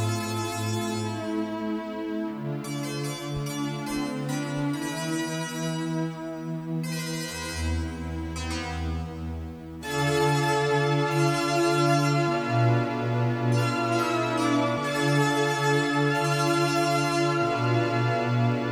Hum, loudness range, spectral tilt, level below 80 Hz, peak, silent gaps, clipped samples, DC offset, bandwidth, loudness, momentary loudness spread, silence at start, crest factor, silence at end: none; 7 LU; -5.5 dB/octave; -46 dBFS; -12 dBFS; none; under 0.1%; under 0.1%; 16.5 kHz; -26 LUFS; 9 LU; 0 s; 14 dB; 0 s